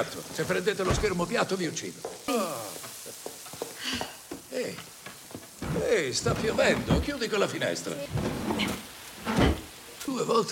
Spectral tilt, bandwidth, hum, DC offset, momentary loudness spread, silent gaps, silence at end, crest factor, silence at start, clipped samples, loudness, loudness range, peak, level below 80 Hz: -4.5 dB/octave; 17 kHz; none; under 0.1%; 14 LU; none; 0 s; 20 dB; 0 s; under 0.1%; -29 LUFS; 7 LU; -10 dBFS; -44 dBFS